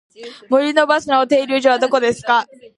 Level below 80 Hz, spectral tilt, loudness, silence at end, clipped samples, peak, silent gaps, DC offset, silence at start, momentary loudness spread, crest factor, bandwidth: -60 dBFS; -3.5 dB/octave; -16 LUFS; 0.35 s; under 0.1%; 0 dBFS; none; under 0.1%; 0.2 s; 4 LU; 16 dB; 11 kHz